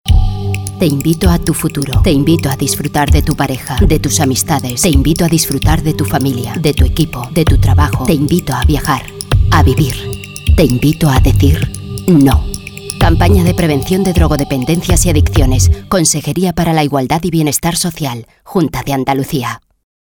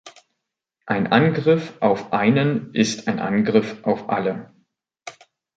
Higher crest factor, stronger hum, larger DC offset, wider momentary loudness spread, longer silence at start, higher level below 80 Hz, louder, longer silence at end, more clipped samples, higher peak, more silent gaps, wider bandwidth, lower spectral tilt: second, 12 dB vs 20 dB; neither; neither; second, 7 LU vs 16 LU; about the same, 0.05 s vs 0.05 s; first, -18 dBFS vs -62 dBFS; first, -12 LUFS vs -20 LUFS; about the same, 0.55 s vs 0.45 s; neither; about the same, 0 dBFS vs -2 dBFS; neither; first, over 20 kHz vs 9 kHz; about the same, -5.5 dB/octave vs -6 dB/octave